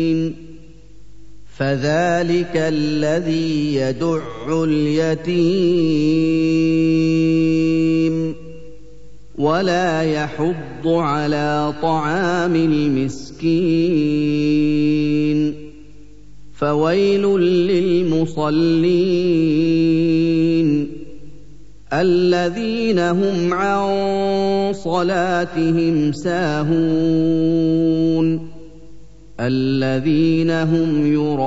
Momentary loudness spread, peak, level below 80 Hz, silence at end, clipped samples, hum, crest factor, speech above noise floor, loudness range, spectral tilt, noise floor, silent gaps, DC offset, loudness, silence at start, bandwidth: 6 LU; -6 dBFS; -46 dBFS; 0 s; under 0.1%; 50 Hz at -40 dBFS; 12 dB; 28 dB; 3 LU; -7 dB/octave; -45 dBFS; none; 2%; -18 LUFS; 0 s; 8 kHz